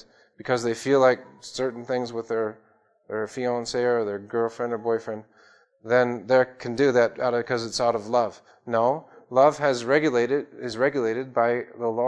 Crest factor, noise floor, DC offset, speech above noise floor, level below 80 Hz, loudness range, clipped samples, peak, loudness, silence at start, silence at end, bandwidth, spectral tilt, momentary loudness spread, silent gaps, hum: 20 dB; -57 dBFS; under 0.1%; 33 dB; -66 dBFS; 5 LU; under 0.1%; -6 dBFS; -24 LUFS; 0.45 s; 0 s; 11 kHz; -5 dB/octave; 11 LU; none; none